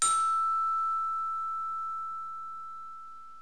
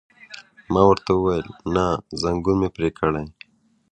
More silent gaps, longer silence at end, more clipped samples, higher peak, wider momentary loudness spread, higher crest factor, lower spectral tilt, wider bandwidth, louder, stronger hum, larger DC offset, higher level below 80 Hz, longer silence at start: neither; second, 0 s vs 0.6 s; neither; second, -12 dBFS vs -2 dBFS; second, 17 LU vs 23 LU; about the same, 20 dB vs 20 dB; second, 1.5 dB/octave vs -7 dB/octave; first, 11 kHz vs 9.8 kHz; second, -30 LUFS vs -21 LUFS; neither; first, 0.4% vs under 0.1%; second, -72 dBFS vs -42 dBFS; second, 0 s vs 0.3 s